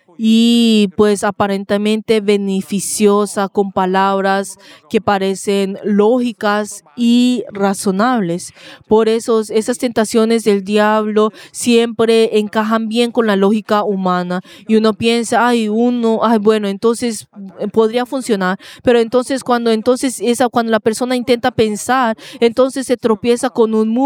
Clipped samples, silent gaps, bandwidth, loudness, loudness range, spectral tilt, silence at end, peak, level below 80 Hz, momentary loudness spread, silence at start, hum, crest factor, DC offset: under 0.1%; none; 16 kHz; -15 LUFS; 2 LU; -5 dB/octave; 0 s; 0 dBFS; -56 dBFS; 6 LU; 0.2 s; none; 14 dB; under 0.1%